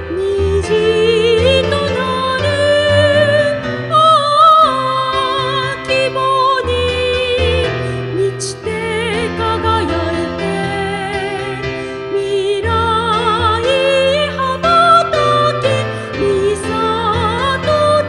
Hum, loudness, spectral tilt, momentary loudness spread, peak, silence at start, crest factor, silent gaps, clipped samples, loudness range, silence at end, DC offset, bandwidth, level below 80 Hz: none; -14 LUFS; -5 dB/octave; 9 LU; 0 dBFS; 0 s; 14 dB; none; under 0.1%; 6 LU; 0 s; under 0.1%; 12 kHz; -34 dBFS